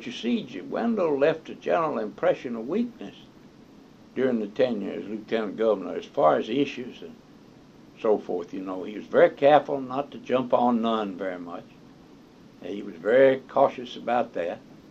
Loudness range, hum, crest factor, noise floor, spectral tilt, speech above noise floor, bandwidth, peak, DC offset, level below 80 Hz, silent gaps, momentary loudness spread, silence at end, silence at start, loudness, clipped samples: 5 LU; none; 22 dB; -51 dBFS; -6.5 dB/octave; 26 dB; 7.4 kHz; -4 dBFS; under 0.1%; -66 dBFS; none; 17 LU; 0.1 s; 0 s; -25 LUFS; under 0.1%